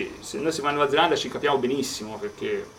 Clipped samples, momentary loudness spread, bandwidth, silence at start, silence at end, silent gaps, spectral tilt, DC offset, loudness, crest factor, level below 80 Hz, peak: under 0.1%; 11 LU; 16.5 kHz; 0 s; 0 s; none; -3.5 dB/octave; under 0.1%; -25 LUFS; 20 dB; -58 dBFS; -6 dBFS